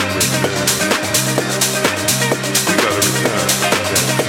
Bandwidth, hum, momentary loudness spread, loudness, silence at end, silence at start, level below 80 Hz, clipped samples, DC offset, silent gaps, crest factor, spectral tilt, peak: 19 kHz; none; 2 LU; -15 LUFS; 0 s; 0 s; -50 dBFS; under 0.1%; under 0.1%; none; 16 dB; -2.5 dB/octave; -2 dBFS